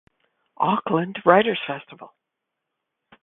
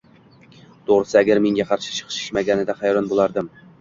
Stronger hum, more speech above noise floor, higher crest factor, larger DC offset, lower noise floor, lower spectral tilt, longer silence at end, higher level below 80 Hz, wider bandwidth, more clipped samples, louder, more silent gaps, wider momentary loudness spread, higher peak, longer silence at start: neither; first, 61 dB vs 31 dB; first, 24 dB vs 18 dB; neither; first, -82 dBFS vs -50 dBFS; first, -10 dB/octave vs -4.5 dB/octave; first, 1.15 s vs 0.3 s; second, -66 dBFS vs -56 dBFS; second, 4.1 kHz vs 7.6 kHz; neither; about the same, -21 LUFS vs -20 LUFS; neither; first, 13 LU vs 10 LU; about the same, 0 dBFS vs -2 dBFS; second, 0.6 s vs 0.9 s